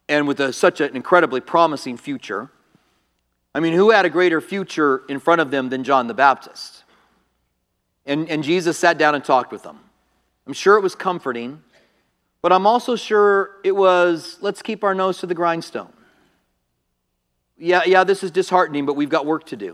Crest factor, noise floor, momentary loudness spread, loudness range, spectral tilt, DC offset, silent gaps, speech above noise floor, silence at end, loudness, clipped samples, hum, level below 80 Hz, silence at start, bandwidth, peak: 20 dB; -72 dBFS; 14 LU; 4 LU; -5 dB/octave; under 0.1%; none; 54 dB; 0 s; -18 LUFS; under 0.1%; none; -72 dBFS; 0.1 s; 13 kHz; 0 dBFS